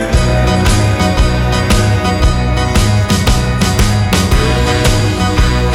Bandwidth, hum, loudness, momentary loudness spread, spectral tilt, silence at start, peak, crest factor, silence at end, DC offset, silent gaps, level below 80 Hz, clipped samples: 17 kHz; none; -12 LUFS; 1 LU; -5 dB/octave; 0 s; 0 dBFS; 10 dB; 0 s; under 0.1%; none; -16 dBFS; under 0.1%